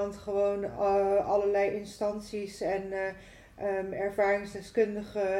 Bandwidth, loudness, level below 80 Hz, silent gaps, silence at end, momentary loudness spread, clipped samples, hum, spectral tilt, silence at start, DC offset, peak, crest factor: 13 kHz; -30 LUFS; -58 dBFS; none; 0 s; 9 LU; under 0.1%; none; -5.5 dB/octave; 0 s; under 0.1%; -16 dBFS; 14 dB